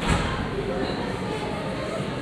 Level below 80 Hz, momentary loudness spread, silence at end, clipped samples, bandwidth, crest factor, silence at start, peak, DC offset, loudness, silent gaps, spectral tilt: -36 dBFS; 5 LU; 0 s; under 0.1%; 13.5 kHz; 16 dB; 0 s; -10 dBFS; under 0.1%; -28 LUFS; none; -5.5 dB/octave